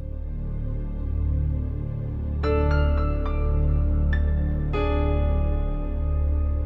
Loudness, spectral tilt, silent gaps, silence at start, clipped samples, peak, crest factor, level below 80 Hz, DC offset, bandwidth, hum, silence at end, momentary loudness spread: -26 LUFS; -10 dB/octave; none; 0 s; under 0.1%; -10 dBFS; 12 dB; -24 dBFS; under 0.1%; 4.5 kHz; none; 0 s; 8 LU